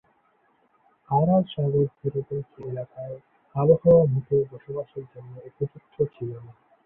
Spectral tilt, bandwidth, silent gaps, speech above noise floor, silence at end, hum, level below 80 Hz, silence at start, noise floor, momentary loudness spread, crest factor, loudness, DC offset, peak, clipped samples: -12.5 dB/octave; 3.6 kHz; none; 41 dB; 0.35 s; none; -58 dBFS; 1.1 s; -65 dBFS; 21 LU; 20 dB; -24 LUFS; under 0.1%; -6 dBFS; under 0.1%